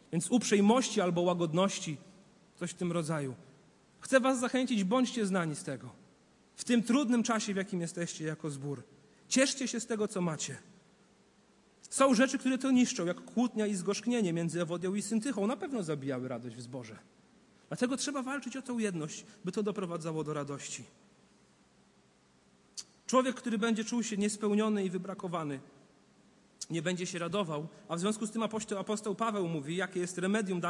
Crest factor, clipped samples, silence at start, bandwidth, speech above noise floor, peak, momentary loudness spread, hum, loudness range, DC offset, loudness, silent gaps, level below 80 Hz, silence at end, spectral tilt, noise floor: 20 dB; under 0.1%; 0.1 s; 11.5 kHz; 34 dB; -14 dBFS; 14 LU; none; 7 LU; under 0.1%; -33 LUFS; none; -78 dBFS; 0 s; -4.5 dB/octave; -66 dBFS